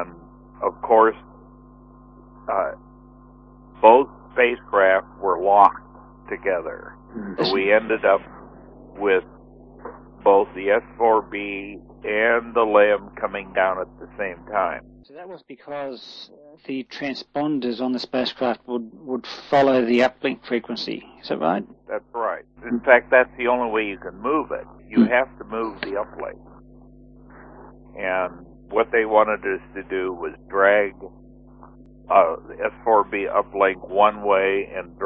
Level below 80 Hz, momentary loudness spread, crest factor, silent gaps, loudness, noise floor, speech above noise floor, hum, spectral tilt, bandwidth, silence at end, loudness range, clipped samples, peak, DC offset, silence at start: -52 dBFS; 17 LU; 22 dB; none; -21 LUFS; -47 dBFS; 26 dB; none; -6 dB/octave; 7 kHz; 0 s; 7 LU; under 0.1%; 0 dBFS; under 0.1%; 0 s